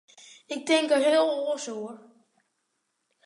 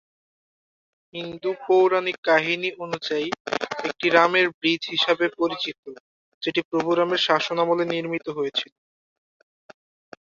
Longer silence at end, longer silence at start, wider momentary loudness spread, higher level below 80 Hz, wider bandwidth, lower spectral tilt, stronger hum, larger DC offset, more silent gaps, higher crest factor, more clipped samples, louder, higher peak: second, 1.3 s vs 1.7 s; second, 0.5 s vs 1.15 s; first, 16 LU vs 12 LU; second, -88 dBFS vs -72 dBFS; first, 11 kHz vs 7.4 kHz; second, -2 dB/octave vs -4.5 dB/octave; neither; neither; second, none vs 2.18-2.23 s, 3.40-3.45 s, 4.54-4.61 s, 5.78-5.83 s, 6.00-6.41 s, 6.65-6.71 s; about the same, 18 dB vs 22 dB; neither; about the same, -25 LUFS vs -23 LUFS; second, -10 dBFS vs -2 dBFS